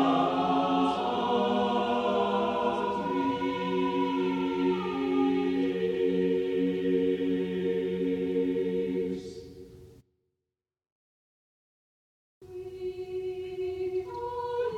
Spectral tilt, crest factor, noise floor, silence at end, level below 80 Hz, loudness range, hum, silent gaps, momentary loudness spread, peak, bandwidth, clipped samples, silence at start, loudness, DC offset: -7 dB/octave; 16 dB; -89 dBFS; 0 s; -62 dBFS; 12 LU; none; 10.92-12.41 s; 9 LU; -14 dBFS; 8.8 kHz; under 0.1%; 0 s; -29 LUFS; under 0.1%